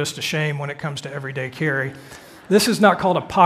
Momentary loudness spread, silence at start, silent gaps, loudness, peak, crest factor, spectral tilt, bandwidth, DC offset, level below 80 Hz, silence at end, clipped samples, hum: 14 LU; 0 s; none; -21 LUFS; 0 dBFS; 20 dB; -4.5 dB/octave; 15.5 kHz; under 0.1%; -56 dBFS; 0 s; under 0.1%; none